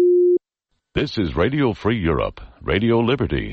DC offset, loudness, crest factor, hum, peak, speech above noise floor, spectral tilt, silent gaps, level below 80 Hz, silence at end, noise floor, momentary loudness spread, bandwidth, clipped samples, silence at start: under 0.1%; -20 LUFS; 12 dB; none; -8 dBFS; 54 dB; -8 dB/octave; none; -36 dBFS; 0 s; -74 dBFS; 8 LU; 6.4 kHz; under 0.1%; 0 s